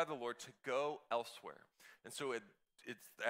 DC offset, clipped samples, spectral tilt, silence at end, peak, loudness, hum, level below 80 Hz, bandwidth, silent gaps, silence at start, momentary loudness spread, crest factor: under 0.1%; under 0.1%; -3 dB/octave; 0 s; -22 dBFS; -44 LUFS; none; under -90 dBFS; 16 kHz; none; 0 s; 17 LU; 22 dB